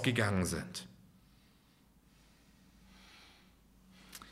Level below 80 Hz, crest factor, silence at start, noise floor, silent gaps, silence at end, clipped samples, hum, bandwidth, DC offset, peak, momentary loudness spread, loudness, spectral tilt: -62 dBFS; 24 dB; 0 s; -66 dBFS; none; 0 s; under 0.1%; none; 16 kHz; under 0.1%; -16 dBFS; 28 LU; -35 LUFS; -4.5 dB/octave